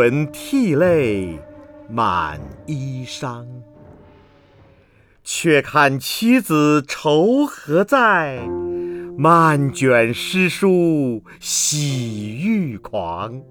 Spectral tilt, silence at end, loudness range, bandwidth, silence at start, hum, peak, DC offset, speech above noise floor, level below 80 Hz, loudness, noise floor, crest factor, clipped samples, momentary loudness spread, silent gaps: -5 dB/octave; 0.05 s; 10 LU; over 20 kHz; 0 s; none; 0 dBFS; under 0.1%; 35 dB; -50 dBFS; -18 LUFS; -53 dBFS; 18 dB; under 0.1%; 14 LU; none